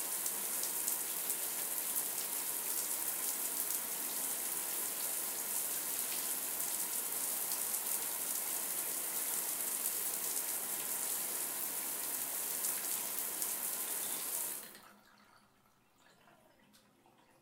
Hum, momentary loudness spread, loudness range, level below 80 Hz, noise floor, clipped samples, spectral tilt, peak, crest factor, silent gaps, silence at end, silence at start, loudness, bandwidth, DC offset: none; 2 LU; 4 LU; -84 dBFS; -70 dBFS; under 0.1%; 1 dB/octave; -14 dBFS; 24 dB; none; 1.1 s; 0 s; -35 LUFS; 18 kHz; under 0.1%